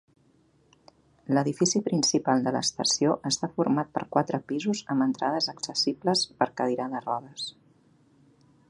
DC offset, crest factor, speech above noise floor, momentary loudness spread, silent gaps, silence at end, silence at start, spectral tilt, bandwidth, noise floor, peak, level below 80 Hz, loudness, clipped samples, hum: under 0.1%; 22 dB; 37 dB; 7 LU; none; 1.2 s; 1.3 s; -4 dB/octave; 11.5 kHz; -64 dBFS; -6 dBFS; -70 dBFS; -27 LUFS; under 0.1%; none